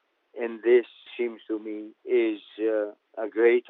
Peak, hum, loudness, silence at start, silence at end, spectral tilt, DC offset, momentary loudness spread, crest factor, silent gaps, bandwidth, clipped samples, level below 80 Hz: -8 dBFS; none; -27 LUFS; 0.35 s; 0.1 s; -2.5 dB/octave; under 0.1%; 15 LU; 18 dB; none; 4 kHz; under 0.1%; under -90 dBFS